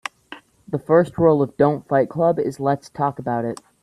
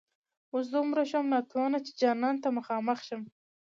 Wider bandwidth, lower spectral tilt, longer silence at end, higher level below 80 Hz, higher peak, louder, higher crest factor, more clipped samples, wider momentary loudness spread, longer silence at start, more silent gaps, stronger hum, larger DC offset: first, 12 kHz vs 7.4 kHz; first, -8 dB/octave vs -5 dB/octave; about the same, 0.3 s vs 0.4 s; first, -54 dBFS vs -86 dBFS; first, -2 dBFS vs -14 dBFS; first, -20 LUFS vs -30 LUFS; about the same, 18 dB vs 16 dB; neither; first, 12 LU vs 9 LU; second, 0.3 s vs 0.55 s; neither; neither; neither